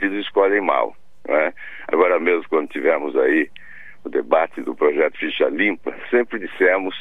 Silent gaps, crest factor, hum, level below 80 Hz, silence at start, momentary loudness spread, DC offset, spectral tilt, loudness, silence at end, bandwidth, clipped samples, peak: none; 18 dB; none; -64 dBFS; 0 s; 9 LU; 1%; -6 dB/octave; -20 LUFS; 0 s; 4 kHz; under 0.1%; -2 dBFS